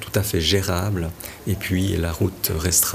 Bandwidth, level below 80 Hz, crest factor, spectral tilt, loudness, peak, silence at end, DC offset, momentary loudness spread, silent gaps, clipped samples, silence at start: 15.5 kHz; -36 dBFS; 16 dB; -4 dB/octave; -22 LUFS; -6 dBFS; 0 s; under 0.1%; 9 LU; none; under 0.1%; 0 s